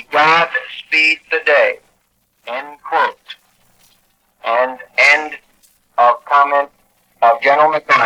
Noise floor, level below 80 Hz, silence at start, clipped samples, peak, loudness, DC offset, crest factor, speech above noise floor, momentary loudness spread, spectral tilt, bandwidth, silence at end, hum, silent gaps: -62 dBFS; -68 dBFS; 0.1 s; under 0.1%; 0 dBFS; -13 LUFS; under 0.1%; 16 dB; 48 dB; 16 LU; -2.5 dB/octave; 14 kHz; 0 s; 60 Hz at -70 dBFS; none